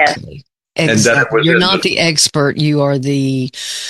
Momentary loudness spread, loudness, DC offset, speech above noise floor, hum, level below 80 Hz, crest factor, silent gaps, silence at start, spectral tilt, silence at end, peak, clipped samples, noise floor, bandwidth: 8 LU; -13 LUFS; under 0.1%; 23 dB; none; -50 dBFS; 14 dB; none; 0 s; -4 dB/octave; 0 s; 0 dBFS; under 0.1%; -36 dBFS; 12.5 kHz